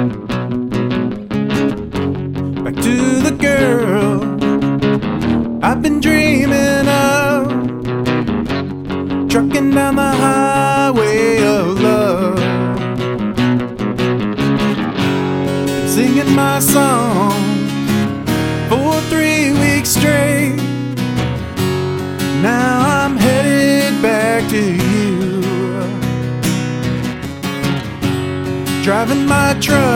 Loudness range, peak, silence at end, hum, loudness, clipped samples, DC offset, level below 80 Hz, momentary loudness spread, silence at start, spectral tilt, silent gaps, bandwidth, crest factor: 3 LU; 0 dBFS; 0 s; none; -15 LUFS; under 0.1%; under 0.1%; -38 dBFS; 7 LU; 0 s; -5.5 dB/octave; none; 17 kHz; 14 dB